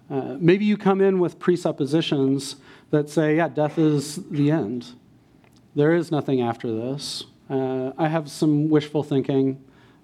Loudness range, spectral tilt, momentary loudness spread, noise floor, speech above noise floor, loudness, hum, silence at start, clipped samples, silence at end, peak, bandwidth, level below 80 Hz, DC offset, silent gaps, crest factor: 3 LU; -6.5 dB/octave; 10 LU; -54 dBFS; 32 dB; -22 LUFS; none; 0.1 s; under 0.1%; 0.45 s; -4 dBFS; 13.5 kHz; -68 dBFS; under 0.1%; none; 18 dB